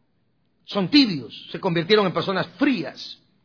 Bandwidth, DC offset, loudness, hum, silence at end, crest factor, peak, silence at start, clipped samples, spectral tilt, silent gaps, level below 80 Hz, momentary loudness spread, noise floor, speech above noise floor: 5.4 kHz; under 0.1%; -21 LUFS; none; 0.3 s; 20 dB; -4 dBFS; 0.7 s; under 0.1%; -6.5 dB/octave; none; -64 dBFS; 16 LU; -69 dBFS; 47 dB